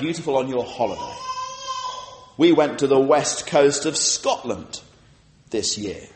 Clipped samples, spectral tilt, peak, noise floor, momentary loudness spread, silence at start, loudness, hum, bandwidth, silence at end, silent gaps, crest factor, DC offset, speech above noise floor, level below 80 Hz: under 0.1%; -3.5 dB/octave; -4 dBFS; -53 dBFS; 14 LU; 0 s; -21 LUFS; none; 8.8 kHz; 0.1 s; none; 18 dB; under 0.1%; 33 dB; -58 dBFS